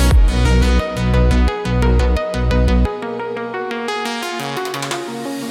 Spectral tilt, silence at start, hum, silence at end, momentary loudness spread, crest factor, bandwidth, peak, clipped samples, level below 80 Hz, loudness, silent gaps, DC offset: -6 dB/octave; 0 s; none; 0 s; 9 LU; 12 dB; 14.5 kHz; -2 dBFS; under 0.1%; -18 dBFS; -18 LUFS; none; under 0.1%